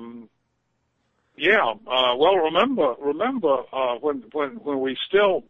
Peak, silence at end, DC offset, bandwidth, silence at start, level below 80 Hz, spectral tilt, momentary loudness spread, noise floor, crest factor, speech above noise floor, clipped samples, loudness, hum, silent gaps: -6 dBFS; 0.1 s; under 0.1%; 6.8 kHz; 0 s; -64 dBFS; -6 dB/octave; 9 LU; -72 dBFS; 18 dB; 51 dB; under 0.1%; -22 LUFS; none; none